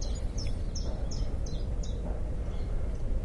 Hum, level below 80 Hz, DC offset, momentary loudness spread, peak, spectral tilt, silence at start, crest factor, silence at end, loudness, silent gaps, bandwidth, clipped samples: none; -32 dBFS; under 0.1%; 1 LU; -20 dBFS; -6 dB/octave; 0 s; 10 dB; 0 s; -36 LUFS; none; 11 kHz; under 0.1%